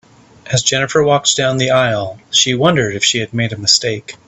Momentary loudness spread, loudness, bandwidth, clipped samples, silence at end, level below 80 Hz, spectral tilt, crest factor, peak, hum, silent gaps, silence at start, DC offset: 6 LU; -14 LUFS; 10.5 kHz; under 0.1%; 0.15 s; -50 dBFS; -3 dB/octave; 16 dB; 0 dBFS; none; none; 0.45 s; under 0.1%